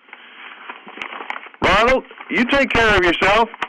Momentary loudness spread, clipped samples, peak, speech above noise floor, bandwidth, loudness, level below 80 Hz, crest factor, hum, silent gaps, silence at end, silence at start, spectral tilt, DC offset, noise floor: 21 LU; under 0.1%; -8 dBFS; 23 dB; 13 kHz; -16 LUFS; -36 dBFS; 12 dB; none; none; 0 s; 0.4 s; -4.5 dB/octave; under 0.1%; -40 dBFS